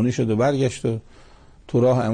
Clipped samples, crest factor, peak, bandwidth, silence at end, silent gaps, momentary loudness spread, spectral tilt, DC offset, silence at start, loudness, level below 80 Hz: under 0.1%; 12 dB; -10 dBFS; 9.8 kHz; 0 s; none; 8 LU; -7 dB/octave; under 0.1%; 0 s; -22 LUFS; -50 dBFS